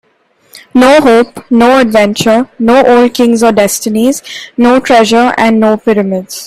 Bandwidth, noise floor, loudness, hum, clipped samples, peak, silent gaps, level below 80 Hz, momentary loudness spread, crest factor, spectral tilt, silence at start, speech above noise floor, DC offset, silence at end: 15.5 kHz; -51 dBFS; -8 LUFS; none; 0.1%; 0 dBFS; none; -44 dBFS; 6 LU; 8 dB; -4.5 dB/octave; 0.55 s; 44 dB; 0.4%; 0 s